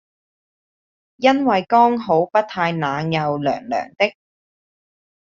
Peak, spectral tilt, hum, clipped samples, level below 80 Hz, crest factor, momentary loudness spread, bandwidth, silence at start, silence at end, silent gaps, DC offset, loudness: -2 dBFS; -4 dB/octave; none; under 0.1%; -62 dBFS; 18 dB; 7 LU; 7.4 kHz; 1.2 s; 1.25 s; none; under 0.1%; -19 LUFS